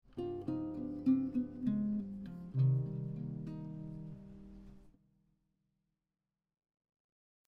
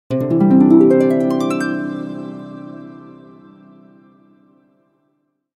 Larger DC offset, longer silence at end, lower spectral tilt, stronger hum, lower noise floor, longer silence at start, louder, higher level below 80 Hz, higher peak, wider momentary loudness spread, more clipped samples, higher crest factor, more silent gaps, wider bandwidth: neither; about the same, 2.6 s vs 2.5 s; first, -11.5 dB/octave vs -8.5 dB/octave; neither; first, under -90 dBFS vs -67 dBFS; about the same, 0.15 s vs 0.1 s; second, -38 LUFS vs -14 LUFS; about the same, -64 dBFS vs -60 dBFS; second, -22 dBFS vs 0 dBFS; second, 19 LU vs 23 LU; neither; about the same, 18 dB vs 18 dB; neither; second, 4.4 kHz vs 12 kHz